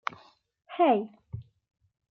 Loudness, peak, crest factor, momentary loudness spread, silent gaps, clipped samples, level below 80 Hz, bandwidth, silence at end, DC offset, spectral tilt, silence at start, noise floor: -27 LUFS; -12 dBFS; 18 dB; 20 LU; none; under 0.1%; -64 dBFS; 6.4 kHz; 0.7 s; under 0.1%; -7.5 dB/octave; 0.7 s; -58 dBFS